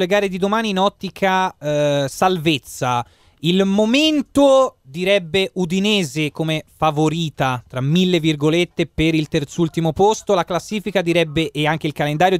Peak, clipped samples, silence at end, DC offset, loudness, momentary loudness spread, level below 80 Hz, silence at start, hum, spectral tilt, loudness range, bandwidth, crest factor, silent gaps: -2 dBFS; under 0.1%; 0 s; under 0.1%; -18 LUFS; 6 LU; -46 dBFS; 0 s; none; -5.5 dB/octave; 2 LU; 16 kHz; 16 dB; none